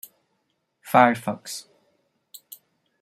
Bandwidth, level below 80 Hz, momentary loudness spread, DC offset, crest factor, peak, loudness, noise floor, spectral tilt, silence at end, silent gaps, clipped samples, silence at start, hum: 16 kHz; -74 dBFS; 25 LU; under 0.1%; 24 dB; -2 dBFS; -21 LUFS; -74 dBFS; -4.5 dB/octave; 1.4 s; none; under 0.1%; 0.85 s; none